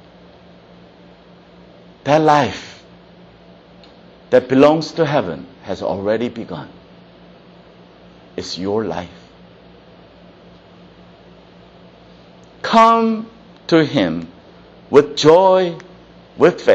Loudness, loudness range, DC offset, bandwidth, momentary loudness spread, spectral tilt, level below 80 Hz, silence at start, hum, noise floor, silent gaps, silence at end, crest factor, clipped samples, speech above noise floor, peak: -16 LUFS; 13 LU; under 0.1%; 8.4 kHz; 21 LU; -6 dB/octave; -54 dBFS; 2.05 s; none; -44 dBFS; none; 0 s; 18 dB; under 0.1%; 30 dB; 0 dBFS